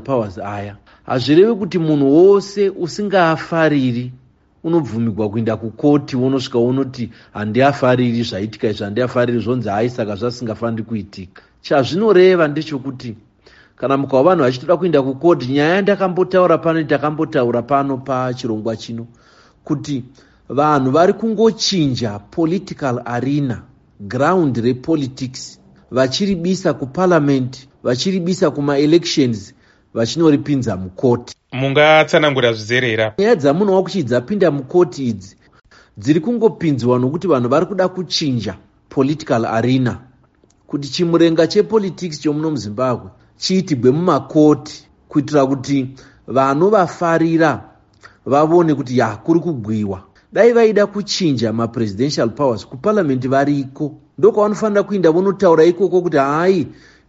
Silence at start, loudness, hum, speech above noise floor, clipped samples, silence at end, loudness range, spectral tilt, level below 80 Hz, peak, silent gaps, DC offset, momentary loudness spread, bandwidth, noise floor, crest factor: 0 s; -16 LUFS; none; 39 dB; under 0.1%; 0.35 s; 4 LU; -5.5 dB/octave; -54 dBFS; 0 dBFS; none; under 0.1%; 12 LU; 8 kHz; -54 dBFS; 16 dB